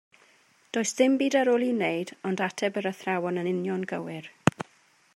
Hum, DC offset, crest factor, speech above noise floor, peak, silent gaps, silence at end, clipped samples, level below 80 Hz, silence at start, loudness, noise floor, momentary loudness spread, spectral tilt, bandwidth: none; under 0.1%; 28 dB; 35 dB; 0 dBFS; none; 0.55 s; under 0.1%; -68 dBFS; 0.75 s; -27 LUFS; -62 dBFS; 10 LU; -5 dB/octave; 13.5 kHz